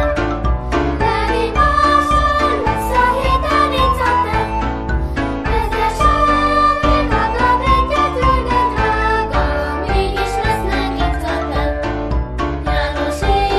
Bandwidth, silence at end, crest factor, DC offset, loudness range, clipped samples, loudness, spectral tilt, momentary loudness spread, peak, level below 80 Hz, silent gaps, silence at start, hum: 13 kHz; 0 s; 14 dB; 0.5%; 4 LU; under 0.1%; -16 LUFS; -6 dB/octave; 7 LU; -2 dBFS; -22 dBFS; none; 0 s; none